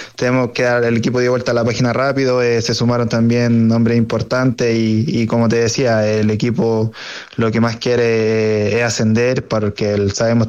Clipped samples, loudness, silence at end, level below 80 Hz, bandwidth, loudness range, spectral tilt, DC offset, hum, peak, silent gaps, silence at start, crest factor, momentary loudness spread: under 0.1%; -15 LUFS; 0 s; -48 dBFS; 8.4 kHz; 1 LU; -6 dB/octave; under 0.1%; none; -4 dBFS; none; 0 s; 10 dB; 3 LU